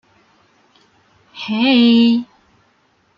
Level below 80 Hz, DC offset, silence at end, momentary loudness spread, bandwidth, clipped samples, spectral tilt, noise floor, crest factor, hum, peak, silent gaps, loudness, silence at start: -66 dBFS; under 0.1%; 0.95 s; 19 LU; 5.8 kHz; under 0.1%; -6 dB/octave; -59 dBFS; 14 dB; none; -4 dBFS; none; -14 LUFS; 1.35 s